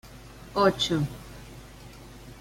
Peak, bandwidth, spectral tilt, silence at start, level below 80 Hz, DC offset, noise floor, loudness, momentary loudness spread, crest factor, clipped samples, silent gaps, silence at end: -10 dBFS; 16.5 kHz; -5 dB/octave; 0.05 s; -50 dBFS; under 0.1%; -46 dBFS; -26 LUFS; 23 LU; 20 dB; under 0.1%; none; 0 s